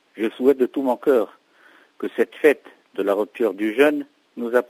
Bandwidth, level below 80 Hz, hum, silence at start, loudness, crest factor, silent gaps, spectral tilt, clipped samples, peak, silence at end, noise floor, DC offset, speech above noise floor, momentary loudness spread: 16 kHz; -82 dBFS; none; 0.15 s; -21 LUFS; 18 dB; none; -5 dB/octave; under 0.1%; -2 dBFS; 0.05 s; -54 dBFS; under 0.1%; 33 dB; 13 LU